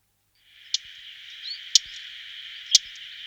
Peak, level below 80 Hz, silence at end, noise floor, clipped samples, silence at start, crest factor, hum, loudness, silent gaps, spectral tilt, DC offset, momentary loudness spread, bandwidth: 0 dBFS; -72 dBFS; 0 s; -65 dBFS; under 0.1%; 0.55 s; 28 dB; none; -23 LUFS; none; 6 dB/octave; under 0.1%; 19 LU; over 20 kHz